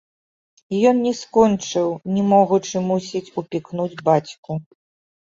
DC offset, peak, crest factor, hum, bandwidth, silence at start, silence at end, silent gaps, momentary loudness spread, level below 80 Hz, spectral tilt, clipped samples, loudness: under 0.1%; -2 dBFS; 18 dB; none; 7.8 kHz; 0.7 s; 0.7 s; 4.38-4.43 s; 12 LU; -58 dBFS; -6 dB/octave; under 0.1%; -20 LUFS